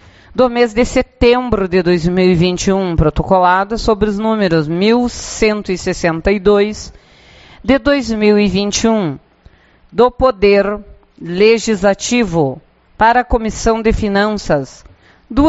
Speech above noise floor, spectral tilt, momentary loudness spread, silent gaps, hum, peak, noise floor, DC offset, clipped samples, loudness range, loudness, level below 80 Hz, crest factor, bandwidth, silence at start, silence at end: 33 dB; -5.5 dB/octave; 8 LU; none; none; 0 dBFS; -46 dBFS; under 0.1%; under 0.1%; 3 LU; -14 LUFS; -30 dBFS; 14 dB; 8.2 kHz; 0.35 s; 0 s